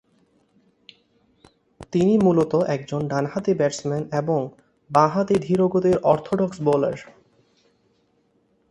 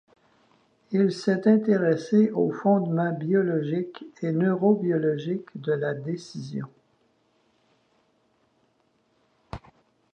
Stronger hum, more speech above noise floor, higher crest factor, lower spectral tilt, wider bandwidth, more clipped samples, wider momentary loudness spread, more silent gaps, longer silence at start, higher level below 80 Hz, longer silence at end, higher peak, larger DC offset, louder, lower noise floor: neither; about the same, 44 dB vs 44 dB; about the same, 20 dB vs 18 dB; about the same, -7.5 dB/octave vs -8 dB/octave; first, 11 kHz vs 9 kHz; neither; second, 8 LU vs 15 LU; neither; first, 1.8 s vs 0.9 s; about the same, -58 dBFS vs -62 dBFS; first, 1.7 s vs 0.55 s; first, -2 dBFS vs -8 dBFS; neither; first, -21 LUFS vs -25 LUFS; about the same, -65 dBFS vs -68 dBFS